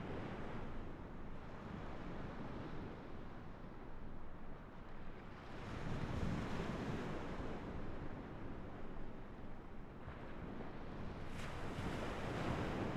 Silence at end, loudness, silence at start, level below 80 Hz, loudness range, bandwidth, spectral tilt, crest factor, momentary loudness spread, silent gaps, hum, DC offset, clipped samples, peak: 0 s; -48 LUFS; 0 s; -52 dBFS; 6 LU; 11 kHz; -7 dB/octave; 16 dB; 11 LU; none; none; under 0.1%; under 0.1%; -30 dBFS